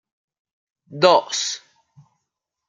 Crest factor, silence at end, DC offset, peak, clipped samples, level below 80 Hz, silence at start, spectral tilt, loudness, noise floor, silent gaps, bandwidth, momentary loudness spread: 22 dB; 1.1 s; under 0.1%; -2 dBFS; under 0.1%; -72 dBFS; 0.9 s; -2.5 dB/octave; -18 LUFS; -81 dBFS; none; 9.4 kHz; 18 LU